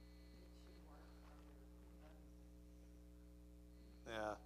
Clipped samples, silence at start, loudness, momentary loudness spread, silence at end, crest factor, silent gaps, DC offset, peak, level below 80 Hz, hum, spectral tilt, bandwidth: under 0.1%; 0 s; -59 LUFS; 12 LU; 0 s; 24 dB; none; under 0.1%; -32 dBFS; -64 dBFS; 60 Hz at -65 dBFS; -5.5 dB/octave; 15 kHz